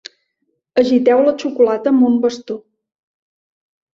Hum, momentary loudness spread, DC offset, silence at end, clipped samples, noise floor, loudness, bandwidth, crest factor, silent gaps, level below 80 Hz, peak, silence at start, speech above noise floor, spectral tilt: none; 14 LU; under 0.1%; 1.35 s; under 0.1%; -70 dBFS; -15 LUFS; 7.4 kHz; 16 dB; none; -62 dBFS; -2 dBFS; 0.75 s; 56 dB; -5.5 dB/octave